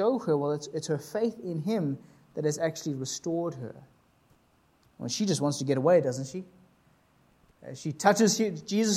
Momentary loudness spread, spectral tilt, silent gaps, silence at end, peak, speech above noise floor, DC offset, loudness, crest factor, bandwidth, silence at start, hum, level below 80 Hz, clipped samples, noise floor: 17 LU; -5 dB/octave; none; 0 s; -6 dBFS; 37 dB; under 0.1%; -29 LUFS; 22 dB; 15.5 kHz; 0 s; none; -72 dBFS; under 0.1%; -66 dBFS